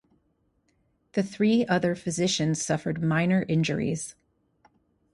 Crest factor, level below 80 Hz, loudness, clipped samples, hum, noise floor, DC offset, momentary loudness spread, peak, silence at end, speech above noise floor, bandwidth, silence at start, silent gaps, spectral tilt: 18 dB; -60 dBFS; -26 LUFS; under 0.1%; none; -71 dBFS; under 0.1%; 7 LU; -10 dBFS; 1 s; 45 dB; 11.5 kHz; 1.15 s; none; -5 dB/octave